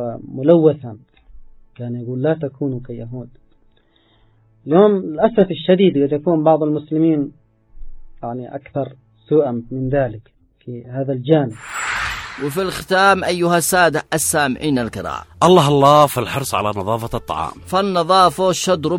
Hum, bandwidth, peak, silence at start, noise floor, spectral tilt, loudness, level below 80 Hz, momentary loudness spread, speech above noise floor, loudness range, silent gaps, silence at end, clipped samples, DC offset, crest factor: none; 17 kHz; 0 dBFS; 0 s; -56 dBFS; -5 dB/octave; -17 LUFS; -44 dBFS; 16 LU; 39 dB; 8 LU; none; 0 s; under 0.1%; under 0.1%; 18 dB